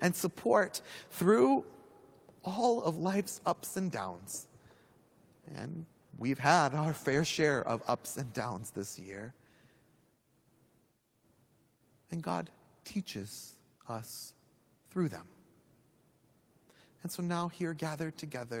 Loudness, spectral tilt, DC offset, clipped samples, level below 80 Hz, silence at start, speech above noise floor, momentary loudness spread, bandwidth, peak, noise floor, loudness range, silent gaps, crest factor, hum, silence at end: -34 LUFS; -5 dB/octave; under 0.1%; under 0.1%; -74 dBFS; 0 s; 39 dB; 19 LU; over 20 kHz; -10 dBFS; -73 dBFS; 13 LU; none; 26 dB; none; 0 s